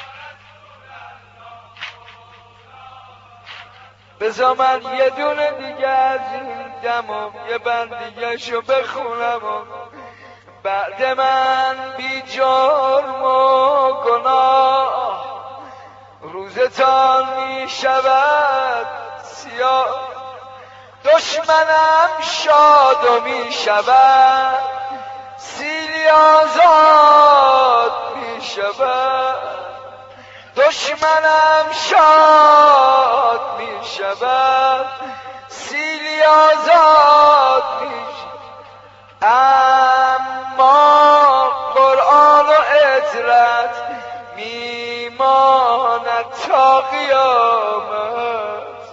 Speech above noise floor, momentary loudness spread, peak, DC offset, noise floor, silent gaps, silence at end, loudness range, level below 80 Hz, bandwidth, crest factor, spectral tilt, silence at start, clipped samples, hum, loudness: 31 dB; 19 LU; 0 dBFS; under 0.1%; -44 dBFS; none; 0 s; 10 LU; -62 dBFS; 8 kHz; 14 dB; 1 dB/octave; 0 s; under 0.1%; none; -13 LUFS